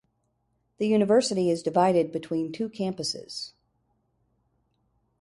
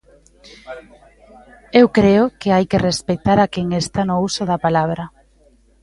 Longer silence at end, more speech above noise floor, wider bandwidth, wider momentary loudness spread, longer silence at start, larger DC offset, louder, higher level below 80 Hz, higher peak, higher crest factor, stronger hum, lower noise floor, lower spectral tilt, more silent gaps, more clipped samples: first, 1.75 s vs 0.75 s; first, 49 dB vs 37 dB; about the same, 11.5 kHz vs 11.5 kHz; second, 13 LU vs 21 LU; first, 0.8 s vs 0.65 s; neither; second, -26 LUFS vs -17 LUFS; second, -68 dBFS vs -44 dBFS; second, -8 dBFS vs 0 dBFS; about the same, 20 dB vs 18 dB; neither; first, -74 dBFS vs -53 dBFS; about the same, -5.5 dB/octave vs -6 dB/octave; neither; neither